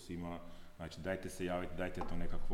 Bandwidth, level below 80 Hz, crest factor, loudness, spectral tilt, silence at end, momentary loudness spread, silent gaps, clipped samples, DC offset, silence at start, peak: 12.5 kHz; -46 dBFS; 14 dB; -43 LUFS; -6 dB/octave; 0 s; 10 LU; none; under 0.1%; under 0.1%; 0 s; -24 dBFS